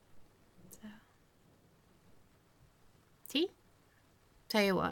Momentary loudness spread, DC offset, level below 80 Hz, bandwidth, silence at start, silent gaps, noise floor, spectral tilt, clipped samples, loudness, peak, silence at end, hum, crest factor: 26 LU; under 0.1%; -70 dBFS; 17.5 kHz; 0.15 s; none; -67 dBFS; -4.5 dB/octave; under 0.1%; -34 LUFS; -18 dBFS; 0 s; none; 22 dB